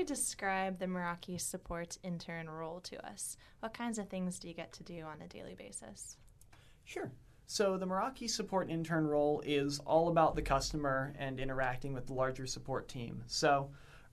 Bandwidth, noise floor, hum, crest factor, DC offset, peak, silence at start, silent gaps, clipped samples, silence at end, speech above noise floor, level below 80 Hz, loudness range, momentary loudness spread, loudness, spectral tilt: 13.5 kHz; -61 dBFS; none; 20 dB; under 0.1%; -18 dBFS; 0 s; none; under 0.1%; 0.05 s; 24 dB; -54 dBFS; 11 LU; 16 LU; -37 LUFS; -4.5 dB/octave